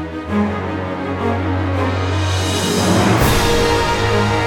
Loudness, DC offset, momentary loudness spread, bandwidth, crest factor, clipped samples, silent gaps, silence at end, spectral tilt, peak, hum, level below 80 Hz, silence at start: -17 LUFS; under 0.1%; 8 LU; 19 kHz; 14 dB; under 0.1%; none; 0 s; -5 dB/octave; -2 dBFS; none; -30 dBFS; 0 s